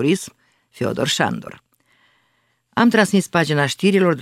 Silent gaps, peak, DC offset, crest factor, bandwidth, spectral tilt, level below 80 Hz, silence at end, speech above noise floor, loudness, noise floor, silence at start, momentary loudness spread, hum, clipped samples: none; 0 dBFS; under 0.1%; 18 dB; 15.5 kHz; -5 dB/octave; -62 dBFS; 0 s; 48 dB; -18 LUFS; -65 dBFS; 0 s; 13 LU; none; under 0.1%